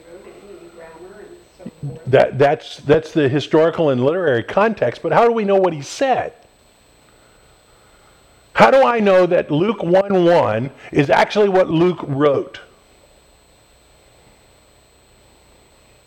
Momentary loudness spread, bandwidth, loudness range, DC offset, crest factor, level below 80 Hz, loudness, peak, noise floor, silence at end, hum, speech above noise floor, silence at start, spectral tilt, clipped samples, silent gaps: 9 LU; 10.5 kHz; 6 LU; under 0.1%; 18 dB; -52 dBFS; -16 LUFS; 0 dBFS; -52 dBFS; 3.45 s; none; 37 dB; 0.1 s; -6.5 dB/octave; under 0.1%; none